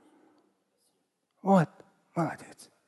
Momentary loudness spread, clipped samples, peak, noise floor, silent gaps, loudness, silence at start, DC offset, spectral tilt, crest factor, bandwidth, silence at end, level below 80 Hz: 18 LU; under 0.1%; -10 dBFS; -77 dBFS; none; -29 LUFS; 1.45 s; under 0.1%; -8 dB/octave; 22 dB; 12 kHz; 0.45 s; -80 dBFS